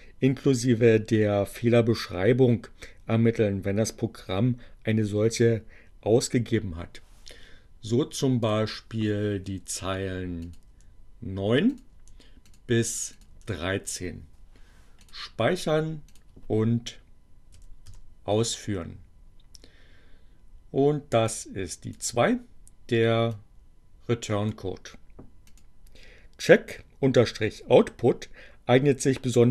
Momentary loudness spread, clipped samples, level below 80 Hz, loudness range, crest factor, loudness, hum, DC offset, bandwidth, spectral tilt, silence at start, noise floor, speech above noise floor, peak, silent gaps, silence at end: 17 LU; under 0.1%; -50 dBFS; 8 LU; 24 dB; -26 LUFS; none; under 0.1%; 13 kHz; -5.5 dB/octave; 0 s; -51 dBFS; 26 dB; -2 dBFS; none; 0 s